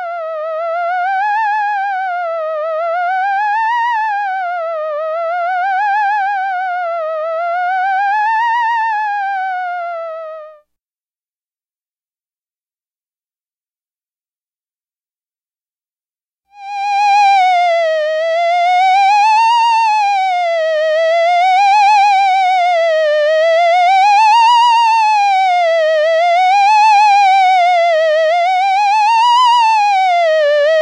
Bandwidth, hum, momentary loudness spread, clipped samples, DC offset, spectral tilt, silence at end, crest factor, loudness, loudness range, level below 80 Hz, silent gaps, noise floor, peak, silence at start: 10.5 kHz; none; 10 LU; under 0.1%; under 0.1%; 4.5 dB/octave; 0 s; 8 dB; -12 LUFS; 8 LU; under -90 dBFS; 10.82-10.86 s, 14.37-14.41 s; under -90 dBFS; -6 dBFS; 0 s